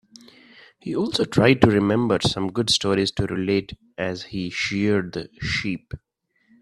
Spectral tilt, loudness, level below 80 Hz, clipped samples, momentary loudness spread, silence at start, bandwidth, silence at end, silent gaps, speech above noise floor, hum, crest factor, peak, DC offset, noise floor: -5 dB/octave; -22 LUFS; -48 dBFS; under 0.1%; 14 LU; 0.85 s; 13 kHz; 0.65 s; none; 40 dB; none; 22 dB; 0 dBFS; under 0.1%; -62 dBFS